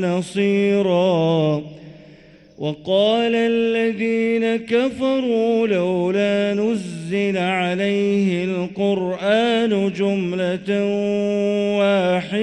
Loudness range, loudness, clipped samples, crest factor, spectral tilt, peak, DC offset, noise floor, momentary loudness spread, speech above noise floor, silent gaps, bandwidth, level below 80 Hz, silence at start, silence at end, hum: 1 LU; -19 LUFS; under 0.1%; 14 dB; -6.5 dB/octave; -6 dBFS; under 0.1%; -46 dBFS; 5 LU; 28 dB; none; 11 kHz; -60 dBFS; 0 s; 0 s; none